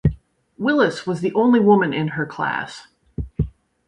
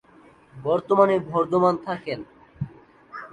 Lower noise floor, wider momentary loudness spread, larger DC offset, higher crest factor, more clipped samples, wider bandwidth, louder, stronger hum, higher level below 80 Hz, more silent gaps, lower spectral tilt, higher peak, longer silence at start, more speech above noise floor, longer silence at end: second, -40 dBFS vs -53 dBFS; about the same, 18 LU vs 17 LU; neither; about the same, 18 dB vs 20 dB; neither; about the same, 10.5 kHz vs 9.6 kHz; about the same, -20 LUFS vs -22 LUFS; neither; first, -38 dBFS vs -58 dBFS; neither; about the same, -7.5 dB/octave vs -8 dB/octave; about the same, -2 dBFS vs -4 dBFS; second, 0.05 s vs 0.55 s; second, 21 dB vs 31 dB; first, 0.4 s vs 0.05 s